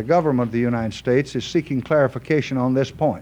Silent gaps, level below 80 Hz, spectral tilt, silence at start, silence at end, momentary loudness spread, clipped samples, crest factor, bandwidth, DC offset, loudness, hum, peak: none; -50 dBFS; -7 dB/octave; 0 s; 0 s; 4 LU; under 0.1%; 14 dB; 9.8 kHz; under 0.1%; -21 LUFS; none; -6 dBFS